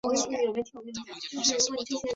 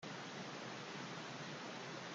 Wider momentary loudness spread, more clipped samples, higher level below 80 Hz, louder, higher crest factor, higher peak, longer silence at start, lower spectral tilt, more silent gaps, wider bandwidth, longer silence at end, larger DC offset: first, 14 LU vs 0 LU; neither; first, -66 dBFS vs -88 dBFS; first, -28 LUFS vs -48 LUFS; about the same, 18 dB vs 14 dB; first, -12 dBFS vs -36 dBFS; about the same, 0.05 s vs 0 s; second, -1.5 dB/octave vs -3.5 dB/octave; neither; second, 8 kHz vs 10.5 kHz; about the same, 0 s vs 0 s; neither